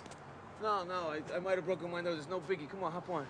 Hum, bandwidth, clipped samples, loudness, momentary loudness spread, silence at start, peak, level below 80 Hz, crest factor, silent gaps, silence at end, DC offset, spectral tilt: none; 10 kHz; under 0.1%; -38 LUFS; 7 LU; 0 s; -22 dBFS; -72 dBFS; 18 dB; none; 0 s; under 0.1%; -5.5 dB/octave